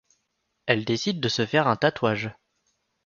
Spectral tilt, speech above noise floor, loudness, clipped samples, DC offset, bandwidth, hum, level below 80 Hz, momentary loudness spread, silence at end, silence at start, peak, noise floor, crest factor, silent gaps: -5 dB/octave; 52 dB; -24 LUFS; under 0.1%; under 0.1%; 7.4 kHz; none; -62 dBFS; 9 LU; 0.75 s; 0.65 s; -4 dBFS; -76 dBFS; 22 dB; none